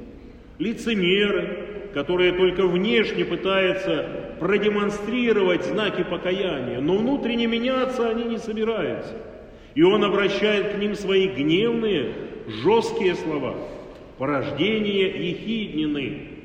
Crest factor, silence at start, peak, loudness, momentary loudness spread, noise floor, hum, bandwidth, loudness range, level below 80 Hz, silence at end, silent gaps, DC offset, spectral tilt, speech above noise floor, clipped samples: 16 dB; 0 s; -6 dBFS; -23 LUFS; 11 LU; -43 dBFS; none; 9.6 kHz; 3 LU; -50 dBFS; 0 s; none; under 0.1%; -6 dB/octave; 21 dB; under 0.1%